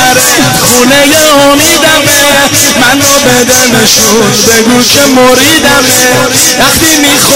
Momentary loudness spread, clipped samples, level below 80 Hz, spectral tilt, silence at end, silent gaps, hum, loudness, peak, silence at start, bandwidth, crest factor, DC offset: 1 LU; 5%; -32 dBFS; -2 dB/octave; 0 s; none; none; -3 LUFS; 0 dBFS; 0 s; over 20 kHz; 4 dB; under 0.1%